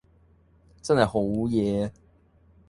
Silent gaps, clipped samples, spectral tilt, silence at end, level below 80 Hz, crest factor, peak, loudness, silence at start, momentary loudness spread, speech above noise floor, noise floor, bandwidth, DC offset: none; under 0.1%; -6.5 dB/octave; 0.8 s; -52 dBFS; 22 dB; -6 dBFS; -25 LUFS; 0.85 s; 10 LU; 35 dB; -59 dBFS; 11.5 kHz; under 0.1%